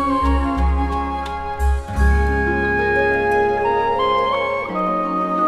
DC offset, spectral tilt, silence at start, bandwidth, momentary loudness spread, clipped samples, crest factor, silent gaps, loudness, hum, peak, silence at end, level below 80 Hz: under 0.1%; -7 dB/octave; 0 s; 11 kHz; 5 LU; under 0.1%; 12 dB; none; -19 LUFS; none; -6 dBFS; 0 s; -24 dBFS